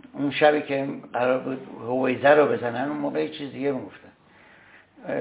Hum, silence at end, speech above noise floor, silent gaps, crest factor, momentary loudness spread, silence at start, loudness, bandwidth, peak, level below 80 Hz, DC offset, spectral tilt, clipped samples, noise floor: none; 0 s; 30 dB; none; 22 dB; 15 LU; 0.15 s; -24 LUFS; 4 kHz; -2 dBFS; -70 dBFS; under 0.1%; -9.5 dB/octave; under 0.1%; -54 dBFS